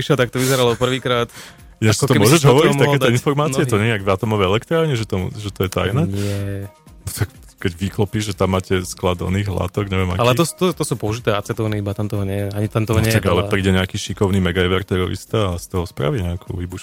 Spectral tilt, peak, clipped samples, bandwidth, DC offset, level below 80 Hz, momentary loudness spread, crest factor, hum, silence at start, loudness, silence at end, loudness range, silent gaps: -5.5 dB/octave; 0 dBFS; under 0.1%; 17 kHz; under 0.1%; -42 dBFS; 10 LU; 18 dB; none; 0 s; -19 LUFS; 0 s; 7 LU; none